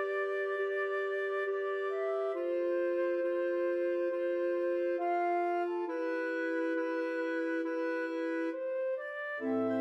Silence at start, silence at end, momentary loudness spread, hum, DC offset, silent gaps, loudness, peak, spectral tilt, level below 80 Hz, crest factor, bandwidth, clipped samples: 0 s; 0 s; 3 LU; none; under 0.1%; none; -34 LUFS; -22 dBFS; -6 dB/octave; under -90 dBFS; 10 dB; 7.4 kHz; under 0.1%